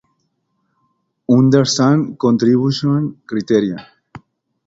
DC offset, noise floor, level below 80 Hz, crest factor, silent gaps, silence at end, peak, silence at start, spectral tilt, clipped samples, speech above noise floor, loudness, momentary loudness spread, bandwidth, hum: under 0.1%; -68 dBFS; -56 dBFS; 16 dB; none; 0.5 s; 0 dBFS; 1.3 s; -6 dB/octave; under 0.1%; 54 dB; -15 LUFS; 12 LU; 8 kHz; none